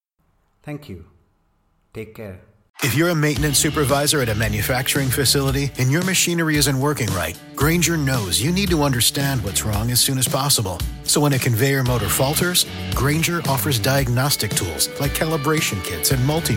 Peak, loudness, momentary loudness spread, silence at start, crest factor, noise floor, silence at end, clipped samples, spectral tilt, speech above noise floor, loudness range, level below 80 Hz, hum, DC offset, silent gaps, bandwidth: -2 dBFS; -19 LUFS; 8 LU; 0.65 s; 18 dB; -64 dBFS; 0 s; under 0.1%; -4 dB/octave; 45 dB; 2 LU; -36 dBFS; none; under 0.1%; 2.70-2.74 s; 17 kHz